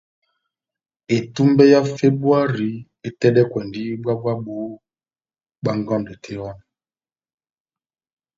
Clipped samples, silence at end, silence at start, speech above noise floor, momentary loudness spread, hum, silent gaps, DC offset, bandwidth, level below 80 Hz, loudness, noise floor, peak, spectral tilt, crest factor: under 0.1%; 1.8 s; 1.1 s; over 72 dB; 18 LU; none; none; under 0.1%; 7.6 kHz; -58 dBFS; -19 LUFS; under -90 dBFS; 0 dBFS; -7.5 dB/octave; 20 dB